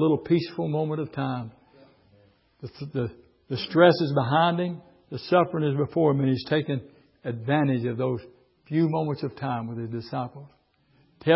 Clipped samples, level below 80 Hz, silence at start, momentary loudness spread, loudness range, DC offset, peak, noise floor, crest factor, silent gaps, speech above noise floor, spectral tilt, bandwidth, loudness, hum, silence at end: under 0.1%; -62 dBFS; 0 s; 13 LU; 7 LU; under 0.1%; -4 dBFS; -64 dBFS; 22 dB; none; 39 dB; -11 dB/octave; 5.8 kHz; -26 LUFS; none; 0 s